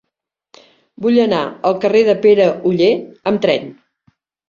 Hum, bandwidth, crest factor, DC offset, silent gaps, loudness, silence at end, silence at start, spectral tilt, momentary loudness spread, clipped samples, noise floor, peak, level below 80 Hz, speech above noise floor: none; 7.2 kHz; 14 dB; under 0.1%; none; -15 LUFS; 0.75 s; 1 s; -6.5 dB/octave; 8 LU; under 0.1%; -78 dBFS; -2 dBFS; -60 dBFS; 64 dB